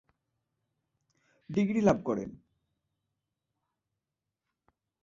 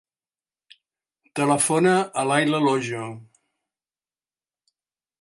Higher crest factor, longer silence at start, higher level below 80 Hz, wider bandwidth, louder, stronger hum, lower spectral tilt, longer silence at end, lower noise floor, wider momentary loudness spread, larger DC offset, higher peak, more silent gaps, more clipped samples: first, 26 dB vs 20 dB; first, 1.5 s vs 1.35 s; first, -64 dBFS vs -72 dBFS; second, 7.4 kHz vs 11.5 kHz; second, -29 LUFS vs -21 LUFS; neither; first, -7.5 dB/octave vs -4.5 dB/octave; first, 2.7 s vs 2 s; about the same, -88 dBFS vs under -90 dBFS; second, 10 LU vs 14 LU; neither; second, -10 dBFS vs -6 dBFS; neither; neither